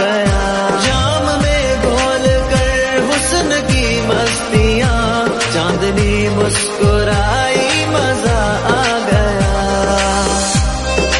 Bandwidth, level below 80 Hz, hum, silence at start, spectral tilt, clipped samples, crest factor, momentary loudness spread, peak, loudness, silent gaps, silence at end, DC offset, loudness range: 11.5 kHz; -22 dBFS; none; 0 s; -4 dB/octave; under 0.1%; 14 dB; 2 LU; 0 dBFS; -14 LUFS; none; 0 s; under 0.1%; 0 LU